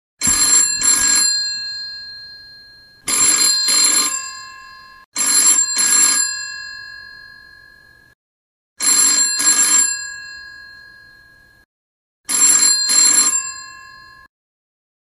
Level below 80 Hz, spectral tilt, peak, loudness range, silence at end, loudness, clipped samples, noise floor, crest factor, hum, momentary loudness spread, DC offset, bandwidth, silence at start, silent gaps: -54 dBFS; 2.5 dB/octave; -2 dBFS; 4 LU; 1.3 s; -12 LUFS; under 0.1%; -48 dBFS; 16 dB; none; 22 LU; under 0.1%; 15.5 kHz; 0.2 s; 5.05-5.12 s, 8.15-8.76 s, 11.65-12.24 s